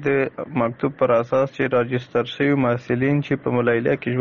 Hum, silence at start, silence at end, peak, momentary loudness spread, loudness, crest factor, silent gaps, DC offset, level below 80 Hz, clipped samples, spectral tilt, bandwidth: none; 0 s; 0 s; -4 dBFS; 5 LU; -21 LUFS; 16 dB; none; under 0.1%; -56 dBFS; under 0.1%; -6 dB/octave; 7 kHz